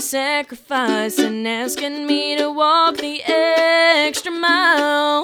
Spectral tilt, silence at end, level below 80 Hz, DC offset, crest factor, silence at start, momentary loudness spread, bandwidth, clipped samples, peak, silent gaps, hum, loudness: -1.5 dB/octave; 0 s; -66 dBFS; under 0.1%; 12 dB; 0 s; 9 LU; over 20 kHz; under 0.1%; -4 dBFS; none; none; -17 LUFS